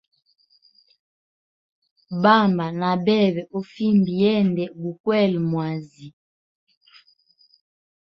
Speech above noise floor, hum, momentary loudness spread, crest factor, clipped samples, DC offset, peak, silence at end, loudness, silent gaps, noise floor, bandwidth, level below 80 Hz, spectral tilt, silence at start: 40 dB; none; 13 LU; 20 dB; under 0.1%; under 0.1%; -2 dBFS; 1.95 s; -21 LUFS; 5.00-5.04 s; -60 dBFS; 6 kHz; -64 dBFS; -8.5 dB/octave; 2.1 s